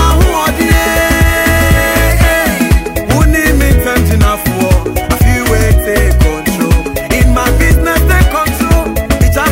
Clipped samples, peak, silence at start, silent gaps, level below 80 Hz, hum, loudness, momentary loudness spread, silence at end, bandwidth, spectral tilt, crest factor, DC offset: under 0.1%; 0 dBFS; 0 s; none; -12 dBFS; none; -10 LUFS; 4 LU; 0 s; 16.5 kHz; -5 dB/octave; 8 dB; under 0.1%